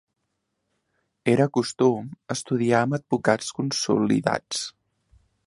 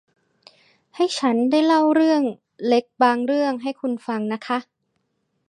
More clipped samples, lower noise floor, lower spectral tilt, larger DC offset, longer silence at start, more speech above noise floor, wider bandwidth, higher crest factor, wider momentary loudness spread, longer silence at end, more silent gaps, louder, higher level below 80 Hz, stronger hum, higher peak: neither; first, -77 dBFS vs -72 dBFS; about the same, -5 dB/octave vs -4.5 dB/octave; neither; first, 1.25 s vs 0.95 s; about the same, 54 dB vs 52 dB; about the same, 11.5 kHz vs 10.5 kHz; about the same, 22 dB vs 18 dB; about the same, 9 LU vs 10 LU; about the same, 0.75 s vs 0.85 s; neither; second, -24 LUFS vs -21 LUFS; first, -64 dBFS vs -78 dBFS; neither; about the same, -4 dBFS vs -4 dBFS